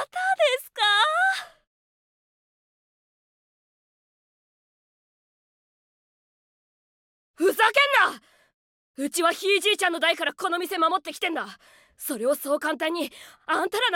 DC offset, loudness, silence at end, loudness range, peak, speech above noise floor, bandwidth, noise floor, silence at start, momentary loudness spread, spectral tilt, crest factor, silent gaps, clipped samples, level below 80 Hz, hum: under 0.1%; -23 LUFS; 0 s; 5 LU; -8 dBFS; over 66 dB; 17 kHz; under -90 dBFS; 0 s; 13 LU; -0.5 dB/octave; 20 dB; 1.67-7.34 s, 8.54-8.94 s; under 0.1%; -78 dBFS; none